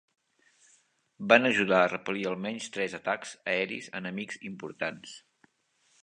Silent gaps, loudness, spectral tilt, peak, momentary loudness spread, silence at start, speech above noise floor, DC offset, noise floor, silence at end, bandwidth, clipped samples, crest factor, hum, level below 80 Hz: none; -29 LUFS; -4.5 dB/octave; -4 dBFS; 18 LU; 1.2 s; 42 dB; under 0.1%; -71 dBFS; 0.85 s; 10 kHz; under 0.1%; 26 dB; none; -74 dBFS